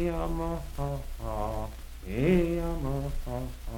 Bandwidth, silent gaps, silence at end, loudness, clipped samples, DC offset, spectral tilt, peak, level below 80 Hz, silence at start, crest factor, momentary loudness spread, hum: 18 kHz; none; 0 s; -32 LUFS; under 0.1%; under 0.1%; -7.5 dB/octave; -12 dBFS; -36 dBFS; 0 s; 18 dB; 12 LU; none